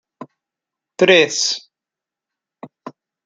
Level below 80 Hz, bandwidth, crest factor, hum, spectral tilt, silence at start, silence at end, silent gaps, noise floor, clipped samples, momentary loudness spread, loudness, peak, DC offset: -68 dBFS; 9.4 kHz; 20 dB; none; -2.5 dB/octave; 0.2 s; 0.35 s; none; -87 dBFS; under 0.1%; 25 LU; -15 LUFS; 0 dBFS; under 0.1%